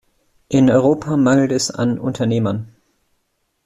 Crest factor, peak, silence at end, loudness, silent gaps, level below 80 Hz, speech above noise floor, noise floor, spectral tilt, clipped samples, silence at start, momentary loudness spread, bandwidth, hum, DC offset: 16 dB; -2 dBFS; 1 s; -17 LUFS; none; -52 dBFS; 53 dB; -69 dBFS; -6 dB/octave; under 0.1%; 0.5 s; 7 LU; 12 kHz; none; under 0.1%